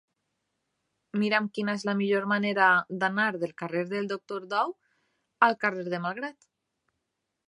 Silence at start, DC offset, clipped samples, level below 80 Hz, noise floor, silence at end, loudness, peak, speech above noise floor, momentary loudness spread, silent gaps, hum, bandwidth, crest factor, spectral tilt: 1.15 s; under 0.1%; under 0.1%; -80 dBFS; -83 dBFS; 1.15 s; -27 LUFS; -6 dBFS; 55 dB; 11 LU; none; none; 11 kHz; 24 dB; -6 dB/octave